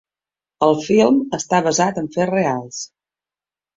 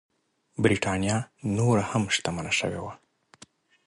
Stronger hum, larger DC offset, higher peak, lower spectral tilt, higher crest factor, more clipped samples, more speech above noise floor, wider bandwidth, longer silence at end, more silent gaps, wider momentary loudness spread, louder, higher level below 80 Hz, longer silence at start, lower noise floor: first, 50 Hz at -45 dBFS vs none; neither; first, -2 dBFS vs -8 dBFS; about the same, -5 dB/octave vs -5 dB/octave; about the same, 18 dB vs 20 dB; neither; first, over 73 dB vs 30 dB; second, 8 kHz vs 11.5 kHz; about the same, 0.9 s vs 0.9 s; neither; first, 13 LU vs 10 LU; first, -18 LUFS vs -26 LUFS; second, -58 dBFS vs -52 dBFS; about the same, 0.6 s vs 0.6 s; first, under -90 dBFS vs -56 dBFS